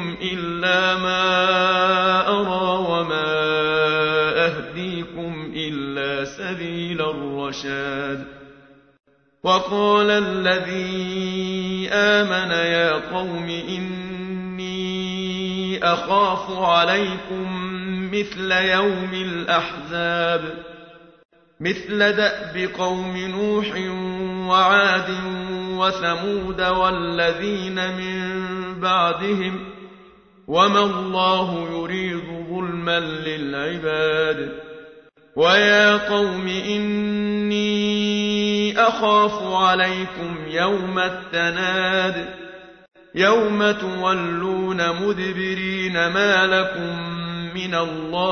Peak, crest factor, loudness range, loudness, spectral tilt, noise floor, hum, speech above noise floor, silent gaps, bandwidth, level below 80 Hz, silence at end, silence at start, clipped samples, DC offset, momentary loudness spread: -2 dBFS; 18 dB; 5 LU; -20 LUFS; -5 dB/octave; -50 dBFS; none; 29 dB; 21.25-21.29 s; 6.6 kHz; -52 dBFS; 0 s; 0 s; under 0.1%; under 0.1%; 11 LU